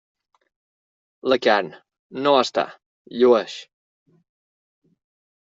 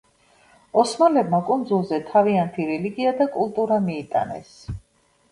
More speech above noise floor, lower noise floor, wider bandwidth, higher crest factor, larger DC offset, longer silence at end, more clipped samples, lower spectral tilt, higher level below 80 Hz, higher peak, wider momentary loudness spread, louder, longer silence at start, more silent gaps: first, over 71 dB vs 41 dB; first, under -90 dBFS vs -62 dBFS; second, 7.8 kHz vs 11.5 kHz; about the same, 22 dB vs 20 dB; neither; first, 1.75 s vs 0.55 s; neither; second, -4 dB/octave vs -6.5 dB/octave; second, -68 dBFS vs -52 dBFS; about the same, -2 dBFS vs -4 dBFS; about the same, 18 LU vs 17 LU; about the same, -20 LUFS vs -21 LUFS; first, 1.25 s vs 0.75 s; first, 1.99-2.10 s, 2.86-3.05 s vs none